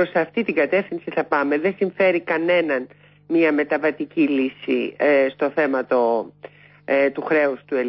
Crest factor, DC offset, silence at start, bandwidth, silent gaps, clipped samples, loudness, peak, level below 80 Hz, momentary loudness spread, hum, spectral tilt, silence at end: 14 dB; under 0.1%; 0 s; 5.8 kHz; none; under 0.1%; -20 LUFS; -6 dBFS; -68 dBFS; 6 LU; 50 Hz at -55 dBFS; -10.5 dB/octave; 0 s